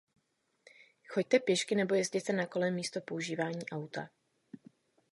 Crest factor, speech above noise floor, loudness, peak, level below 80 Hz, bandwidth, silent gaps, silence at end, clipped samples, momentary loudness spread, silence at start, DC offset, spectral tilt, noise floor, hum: 22 dB; 45 dB; -33 LUFS; -14 dBFS; -82 dBFS; 11.5 kHz; none; 0.55 s; under 0.1%; 11 LU; 1.1 s; under 0.1%; -4.5 dB/octave; -78 dBFS; none